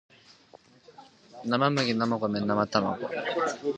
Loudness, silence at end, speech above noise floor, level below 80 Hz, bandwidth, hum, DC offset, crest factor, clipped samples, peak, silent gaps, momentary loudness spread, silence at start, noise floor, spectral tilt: -28 LUFS; 0 s; 29 dB; -66 dBFS; 9 kHz; none; under 0.1%; 22 dB; under 0.1%; -6 dBFS; none; 6 LU; 1 s; -56 dBFS; -5.5 dB/octave